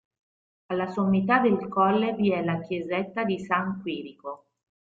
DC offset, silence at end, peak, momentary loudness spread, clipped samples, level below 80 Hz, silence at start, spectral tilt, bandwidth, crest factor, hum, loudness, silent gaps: under 0.1%; 0.55 s; -8 dBFS; 14 LU; under 0.1%; -66 dBFS; 0.7 s; -8 dB/octave; 7.4 kHz; 18 dB; none; -26 LUFS; none